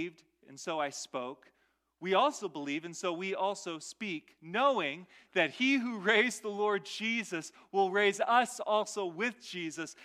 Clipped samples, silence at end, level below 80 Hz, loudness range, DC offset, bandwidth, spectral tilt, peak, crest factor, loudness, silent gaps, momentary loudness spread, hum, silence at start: under 0.1%; 0 s; -86 dBFS; 5 LU; under 0.1%; 14.5 kHz; -3 dB/octave; -14 dBFS; 20 dB; -32 LUFS; none; 12 LU; none; 0 s